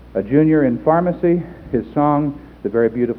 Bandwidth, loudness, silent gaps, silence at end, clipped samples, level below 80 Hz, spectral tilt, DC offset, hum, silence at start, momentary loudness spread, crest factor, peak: 4.1 kHz; -17 LUFS; none; 0 s; under 0.1%; -44 dBFS; -11.5 dB/octave; under 0.1%; none; 0.15 s; 9 LU; 16 dB; 0 dBFS